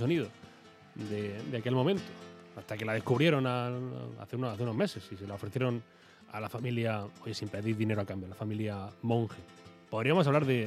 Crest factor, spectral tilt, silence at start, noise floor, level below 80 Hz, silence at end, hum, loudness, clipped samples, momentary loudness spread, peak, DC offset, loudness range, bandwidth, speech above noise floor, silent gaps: 22 dB; -7 dB/octave; 0 s; -56 dBFS; -76 dBFS; 0 s; none; -33 LUFS; under 0.1%; 16 LU; -12 dBFS; under 0.1%; 4 LU; 14 kHz; 23 dB; none